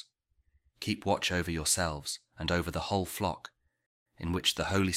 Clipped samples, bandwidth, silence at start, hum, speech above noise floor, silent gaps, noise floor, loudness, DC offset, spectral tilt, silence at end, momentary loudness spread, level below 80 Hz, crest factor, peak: under 0.1%; 16 kHz; 0.8 s; none; 41 dB; 3.86-4.06 s; -73 dBFS; -32 LUFS; under 0.1%; -3.5 dB/octave; 0 s; 11 LU; -50 dBFS; 22 dB; -12 dBFS